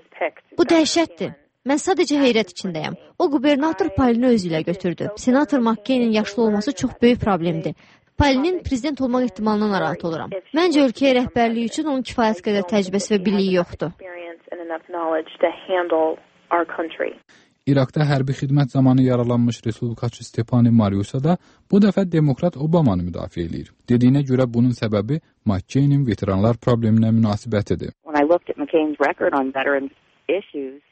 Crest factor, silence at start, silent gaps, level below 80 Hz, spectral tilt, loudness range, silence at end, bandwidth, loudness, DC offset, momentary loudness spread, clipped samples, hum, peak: 16 dB; 0.15 s; none; -46 dBFS; -6.5 dB/octave; 3 LU; 0.15 s; 8.8 kHz; -20 LUFS; under 0.1%; 11 LU; under 0.1%; none; -4 dBFS